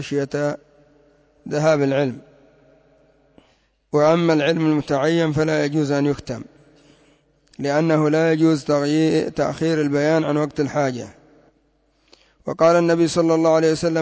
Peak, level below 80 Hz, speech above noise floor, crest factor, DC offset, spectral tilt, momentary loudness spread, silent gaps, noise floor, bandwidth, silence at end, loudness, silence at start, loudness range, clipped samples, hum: -6 dBFS; -56 dBFS; 44 dB; 14 dB; under 0.1%; -6.5 dB/octave; 11 LU; none; -62 dBFS; 8 kHz; 0 s; -19 LUFS; 0 s; 4 LU; under 0.1%; none